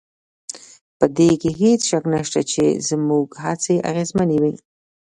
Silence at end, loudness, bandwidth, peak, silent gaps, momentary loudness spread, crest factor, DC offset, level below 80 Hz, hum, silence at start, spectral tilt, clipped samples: 0.5 s; -19 LUFS; 11 kHz; 0 dBFS; 0.81-1.00 s; 18 LU; 20 dB; under 0.1%; -54 dBFS; none; 0.5 s; -5 dB/octave; under 0.1%